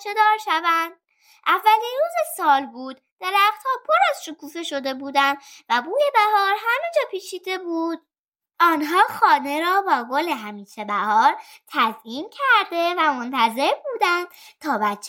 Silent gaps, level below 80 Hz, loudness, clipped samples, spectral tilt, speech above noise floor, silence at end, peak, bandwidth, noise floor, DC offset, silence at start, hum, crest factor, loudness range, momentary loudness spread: 3.12-3.17 s, 8.19-8.32 s; -84 dBFS; -20 LUFS; under 0.1%; -2.5 dB/octave; 32 dB; 0 s; -4 dBFS; 17 kHz; -54 dBFS; under 0.1%; 0 s; none; 18 dB; 1 LU; 14 LU